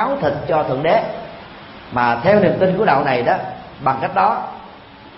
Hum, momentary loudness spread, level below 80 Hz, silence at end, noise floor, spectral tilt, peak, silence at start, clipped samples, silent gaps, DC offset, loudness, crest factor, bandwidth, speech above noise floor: none; 19 LU; -50 dBFS; 0 s; -40 dBFS; -11 dB/octave; 0 dBFS; 0 s; under 0.1%; none; under 0.1%; -17 LUFS; 16 dB; 5.8 kHz; 23 dB